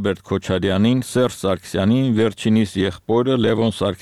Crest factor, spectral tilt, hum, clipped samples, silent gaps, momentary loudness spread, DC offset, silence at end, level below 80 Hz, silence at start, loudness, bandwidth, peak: 12 dB; -6.5 dB/octave; none; under 0.1%; none; 5 LU; 0.3%; 0.05 s; -48 dBFS; 0 s; -19 LUFS; 13.5 kHz; -6 dBFS